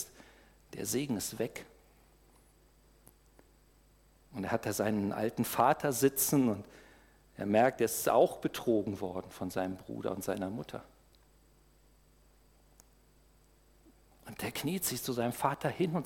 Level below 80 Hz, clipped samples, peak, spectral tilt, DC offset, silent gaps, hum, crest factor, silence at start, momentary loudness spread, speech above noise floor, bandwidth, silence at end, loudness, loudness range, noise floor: -64 dBFS; under 0.1%; -14 dBFS; -4.5 dB/octave; under 0.1%; none; none; 22 dB; 0 s; 13 LU; 32 dB; 18.5 kHz; 0 s; -33 LUFS; 14 LU; -64 dBFS